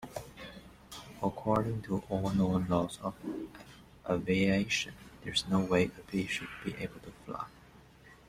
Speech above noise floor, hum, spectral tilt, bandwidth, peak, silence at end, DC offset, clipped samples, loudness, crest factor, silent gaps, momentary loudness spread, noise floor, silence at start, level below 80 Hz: 25 dB; none; -5.5 dB/octave; 15 kHz; -14 dBFS; 0.15 s; under 0.1%; under 0.1%; -33 LUFS; 20 dB; none; 19 LU; -57 dBFS; 0 s; -58 dBFS